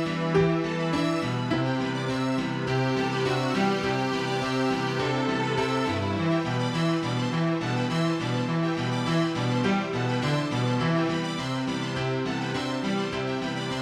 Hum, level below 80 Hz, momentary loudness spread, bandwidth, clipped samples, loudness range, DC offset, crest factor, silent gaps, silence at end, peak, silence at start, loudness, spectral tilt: none; -56 dBFS; 4 LU; 12.5 kHz; under 0.1%; 1 LU; under 0.1%; 16 dB; none; 0 s; -10 dBFS; 0 s; -26 LUFS; -6 dB/octave